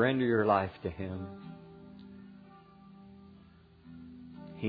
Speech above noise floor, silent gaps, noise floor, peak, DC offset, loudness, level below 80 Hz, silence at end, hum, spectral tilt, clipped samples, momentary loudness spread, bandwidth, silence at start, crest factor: 27 dB; none; -58 dBFS; -12 dBFS; under 0.1%; -31 LUFS; -64 dBFS; 0 s; none; -5.5 dB/octave; under 0.1%; 28 LU; 5 kHz; 0 s; 22 dB